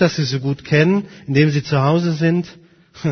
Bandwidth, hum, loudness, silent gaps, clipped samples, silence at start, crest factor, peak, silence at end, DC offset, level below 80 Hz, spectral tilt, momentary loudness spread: 6.6 kHz; none; -17 LUFS; none; under 0.1%; 0 s; 18 dB; 0 dBFS; 0 s; under 0.1%; -52 dBFS; -7 dB/octave; 7 LU